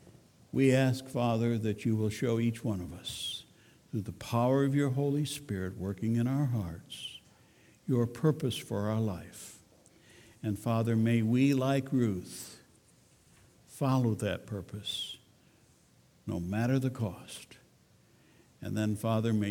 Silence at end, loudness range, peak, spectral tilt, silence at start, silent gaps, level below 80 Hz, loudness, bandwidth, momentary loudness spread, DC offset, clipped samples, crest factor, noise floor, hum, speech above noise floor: 0 s; 5 LU; -14 dBFS; -6.5 dB/octave; 0.05 s; none; -64 dBFS; -32 LUFS; 17 kHz; 16 LU; under 0.1%; under 0.1%; 18 dB; -64 dBFS; none; 33 dB